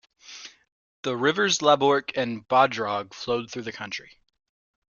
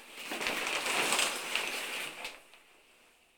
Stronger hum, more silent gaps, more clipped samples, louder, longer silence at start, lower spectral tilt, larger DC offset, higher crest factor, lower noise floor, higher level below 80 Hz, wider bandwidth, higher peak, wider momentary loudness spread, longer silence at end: neither; first, 0.72-1.03 s vs none; neither; first, -24 LUFS vs -32 LUFS; first, 0.3 s vs 0 s; first, -3.5 dB/octave vs 0 dB/octave; neither; about the same, 22 dB vs 24 dB; second, -45 dBFS vs -64 dBFS; about the same, -66 dBFS vs -70 dBFS; second, 7.4 kHz vs 19.5 kHz; first, -4 dBFS vs -12 dBFS; first, 22 LU vs 14 LU; about the same, 0.9 s vs 0.8 s